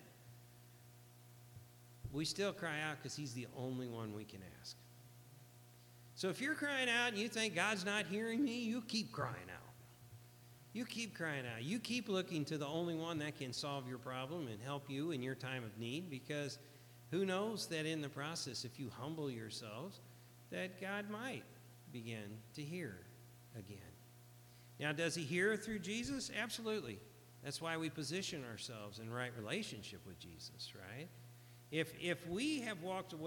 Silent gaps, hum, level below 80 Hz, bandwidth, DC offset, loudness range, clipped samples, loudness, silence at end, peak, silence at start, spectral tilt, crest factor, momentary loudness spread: none; 60 Hz at -65 dBFS; -74 dBFS; 19 kHz; under 0.1%; 9 LU; under 0.1%; -43 LUFS; 0 s; -22 dBFS; 0 s; -4 dB/octave; 24 dB; 22 LU